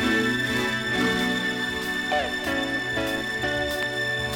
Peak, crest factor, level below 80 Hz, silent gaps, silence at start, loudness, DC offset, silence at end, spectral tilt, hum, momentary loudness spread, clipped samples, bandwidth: -12 dBFS; 14 dB; -48 dBFS; none; 0 s; -25 LUFS; under 0.1%; 0 s; -4 dB/octave; none; 4 LU; under 0.1%; 20 kHz